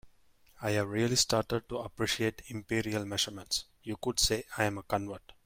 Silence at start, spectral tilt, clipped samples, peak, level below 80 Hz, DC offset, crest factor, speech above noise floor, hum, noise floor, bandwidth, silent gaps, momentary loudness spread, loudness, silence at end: 0.05 s; -3.5 dB/octave; under 0.1%; -12 dBFS; -54 dBFS; under 0.1%; 22 dB; 30 dB; none; -63 dBFS; 16.5 kHz; none; 10 LU; -32 LUFS; 0.15 s